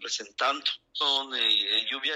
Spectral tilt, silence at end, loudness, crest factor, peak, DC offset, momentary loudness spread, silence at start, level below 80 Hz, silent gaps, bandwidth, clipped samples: 1.5 dB/octave; 0 s; -25 LUFS; 16 dB; -12 dBFS; under 0.1%; 7 LU; 0 s; -78 dBFS; none; 14 kHz; under 0.1%